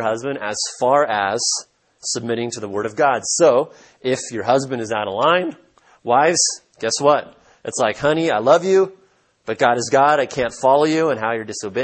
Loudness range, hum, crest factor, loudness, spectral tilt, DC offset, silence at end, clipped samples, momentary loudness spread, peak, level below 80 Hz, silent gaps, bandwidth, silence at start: 3 LU; none; 18 dB; -18 LUFS; -3 dB/octave; under 0.1%; 0 s; under 0.1%; 10 LU; 0 dBFS; -60 dBFS; none; 8.8 kHz; 0 s